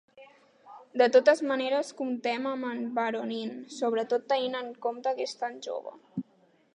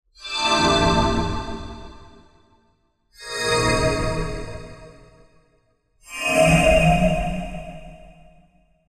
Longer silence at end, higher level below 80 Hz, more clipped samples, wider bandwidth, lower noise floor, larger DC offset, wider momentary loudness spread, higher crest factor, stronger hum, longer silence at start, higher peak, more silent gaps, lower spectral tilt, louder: second, 0.55 s vs 0.9 s; second, -86 dBFS vs -34 dBFS; neither; second, 10.5 kHz vs 14.5 kHz; about the same, -65 dBFS vs -64 dBFS; neither; second, 16 LU vs 22 LU; about the same, 20 dB vs 20 dB; neither; about the same, 0.15 s vs 0.2 s; second, -10 dBFS vs -4 dBFS; neither; about the same, -4 dB/octave vs -4.5 dB/octave; second, -29 LUFS vs -20 LUFS